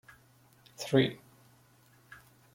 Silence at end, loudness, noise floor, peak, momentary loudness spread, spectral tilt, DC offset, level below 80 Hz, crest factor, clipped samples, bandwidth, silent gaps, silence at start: 0.4 s; -30 LUFS; -63 dBFS; -12 dBFS; 26 LU; -6 dB/octave; under 0.1%; -72 dBFS; 24 dB; under 0.1%; 16.5 kHz; none; 0.8 s